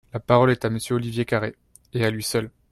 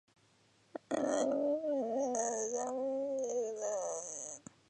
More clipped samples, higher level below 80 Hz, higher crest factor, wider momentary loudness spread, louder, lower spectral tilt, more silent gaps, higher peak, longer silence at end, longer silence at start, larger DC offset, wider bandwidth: neither; first, -54 dBFS vs -84 dBFS; about the same, 20 dB vs 16 dB; about the same, 9 LU vs 9 LU; first, -23 LUFS vs -36 LUFS; first, -5.5 dB/octave vs -3 dB/octave; neither; first, -4 dBFS vs -20 dBFS; about the same, 0.25 s vs 0.3 s; second, 0.15 s vs 0.75 s; neither; first, 13.5 kHz vs 10 kHz